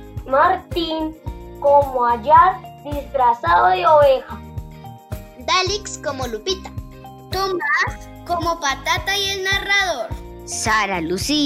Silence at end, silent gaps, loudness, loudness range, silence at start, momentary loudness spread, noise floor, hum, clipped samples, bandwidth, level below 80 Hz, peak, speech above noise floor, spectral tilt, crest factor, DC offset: 0 s; none; -18 LUFS; 7 LU; 0 s; 21 LU; -38 dBFS; none; under 0.1%; 16 kHz; -38 dBFS; -2 dBFS; 20 dB; -3.5 dB/octave; 18 dB; under 0.1%